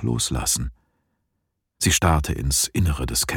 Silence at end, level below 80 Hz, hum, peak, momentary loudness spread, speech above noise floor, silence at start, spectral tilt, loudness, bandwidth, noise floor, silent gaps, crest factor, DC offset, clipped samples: 0 s; -32 dBFS; none; -6 dBFS; 5 LU; 55 dB; 0 s; -3.5 dB/octave; -21 LUFS; 18.5 kHz; -76 dBFS; none; 18 dB; under 0.1%; under 0.1%